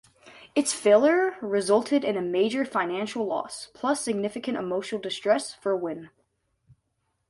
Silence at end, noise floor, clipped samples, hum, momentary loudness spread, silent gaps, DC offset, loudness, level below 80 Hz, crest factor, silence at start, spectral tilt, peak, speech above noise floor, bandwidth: 1.25 s; -76 dBFS; under 0.1%; none; 11 LU; none; under 0.1%; -26 LUFS; -72 dBFS; 18 dB; 0.25 s; -4 dB/octave; -8 dBFS; 50 dB; 11.5 kHz